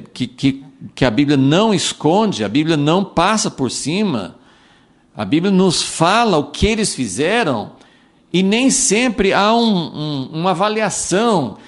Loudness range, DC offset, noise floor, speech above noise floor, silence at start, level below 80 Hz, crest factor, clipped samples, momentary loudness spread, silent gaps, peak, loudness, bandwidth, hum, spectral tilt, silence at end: 2 LU; under 0.1%; -51 dBFS; 36 dB; 0 s; -40 dBFS; 16 dB; under 0.1%; 9 LU; none; 0 dBFS; -16 LUFS; 11.5 kHz; none; -4.5 dB/octave; 0.1 s